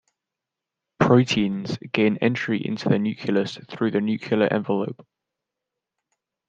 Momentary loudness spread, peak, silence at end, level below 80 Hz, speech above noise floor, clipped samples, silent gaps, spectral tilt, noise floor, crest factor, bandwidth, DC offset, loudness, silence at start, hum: 9 LU; -2 dBFS; 1.55 s; -62 dBFS; 63 dB; under 0.1%; none; -6.5 dB/octave; -86 dBFS; 22 dB; 7.8 kHz; under 0.1%; -23 LUFS; 1 s; none